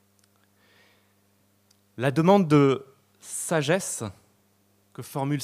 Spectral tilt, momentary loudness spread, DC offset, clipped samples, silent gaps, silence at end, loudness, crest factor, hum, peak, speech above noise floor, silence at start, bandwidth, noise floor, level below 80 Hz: -5.5 dB/octave; 17 LU; under 0.1%; under 0.1%; none; 0 s; -24 LUFS; 22 dB; 50 Hz at -50 dBFS; -4 dBFS; 42 dB; 2 s; 15.5 kHz; -65 dBFS; -68 dBFS